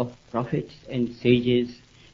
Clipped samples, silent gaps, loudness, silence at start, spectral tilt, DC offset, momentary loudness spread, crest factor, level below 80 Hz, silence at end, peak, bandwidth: under 0.1%; none; -25 LUFS; 0 s; -8 dB/octave; under 0.1%; 11 LU; 20 dB; -54 dBFS; 0.4 s; -6 dBFS; 7.2 kHz